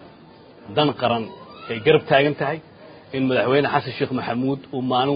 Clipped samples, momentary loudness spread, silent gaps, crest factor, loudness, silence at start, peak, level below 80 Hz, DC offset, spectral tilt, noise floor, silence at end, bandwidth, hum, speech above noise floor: under 0.1%; 13 LU; none; 20 dB; -21 LUFS; 0 s; -2 dBFS; -58 dBFS; under 0.1%; -11 dB/octave; -46 dBFS; 0 s; 5.2 kHz; none; 26 dB